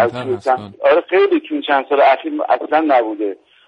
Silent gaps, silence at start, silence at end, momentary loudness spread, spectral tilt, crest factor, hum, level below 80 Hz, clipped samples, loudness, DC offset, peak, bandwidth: none; 0 s; 0.35 s; 8 LU; -6.5 dB/octave; 14 dB; none; -62 dBFS; under 0.1%; -16 LUFS; under 0.1%; -2 dBFS; 9.2 kHz